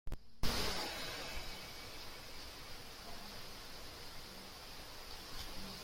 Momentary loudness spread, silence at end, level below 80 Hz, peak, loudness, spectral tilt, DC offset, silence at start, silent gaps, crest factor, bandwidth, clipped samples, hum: 11 LU; 0 s; -52 dBFS; -20 dBFS; -46 LUFS; -2.5 dB/octave; under 0.1%; 0.05 s; none; 22 dB; 16.5 kHz; under 0.1%; none